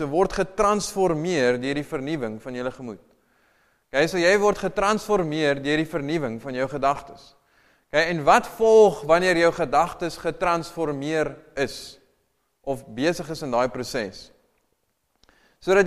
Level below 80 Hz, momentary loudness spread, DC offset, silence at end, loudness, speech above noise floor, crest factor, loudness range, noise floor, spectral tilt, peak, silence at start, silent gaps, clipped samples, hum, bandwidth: -50 dBFS; 13 LU; under 0.1%; 0 s; -23 LUFS; 50 dB; 20 dB; 9 LU; -72 dBFS; -5 dB/octave; -4 dBFS; 0 s; none; under 0.1%; none; 14.5 kHz